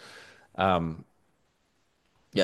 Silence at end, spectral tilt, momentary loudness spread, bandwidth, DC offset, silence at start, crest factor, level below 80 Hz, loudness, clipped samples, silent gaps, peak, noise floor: 0 s; -6 dB/octave; 22 LU; 12 kHz; under 0.1%; 0.05 s; 22 dB; -58 dBFS; -28 LUFS; under 0.1%; none; -10 dBFS; -72 dBFS